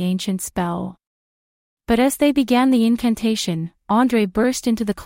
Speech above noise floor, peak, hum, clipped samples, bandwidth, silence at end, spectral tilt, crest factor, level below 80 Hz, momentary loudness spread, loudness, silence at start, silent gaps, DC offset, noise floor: over 72 dB; -4 dBFS; none; under 0.1%; 16.5 kHz; 0 s; -5 dB/octave; 16 dB; -46 dBFS; 8 LU; -19 LUFS; 0 s; 1.07-1.77 s; under 0.1%; under -90 dBFS